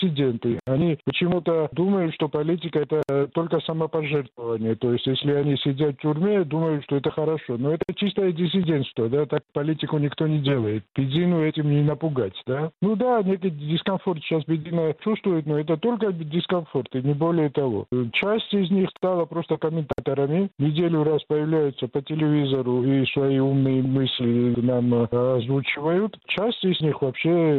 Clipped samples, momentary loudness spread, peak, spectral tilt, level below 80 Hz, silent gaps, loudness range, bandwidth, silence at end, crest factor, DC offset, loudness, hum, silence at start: under 0.1%; 4 LU; -10 dBFS; -10 dB/octave; -60 dBFS; none; 2 LU; 4.4 kHz; 0 s; 12 dB; under 0.1%; -23 LUFS; none; 0 s